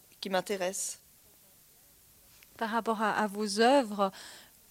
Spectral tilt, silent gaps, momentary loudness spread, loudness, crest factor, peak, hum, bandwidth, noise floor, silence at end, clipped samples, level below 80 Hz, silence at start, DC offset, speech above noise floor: -3.5 dB/octave; none; 22 LU; -30 LUFS; 20 dB; -12 dBFS; none; 16.5 kHz; -60 dBFS; 0.3 s; under 0.1%; -74 dBFS; 0.2 s; under 0.1%; 30 dB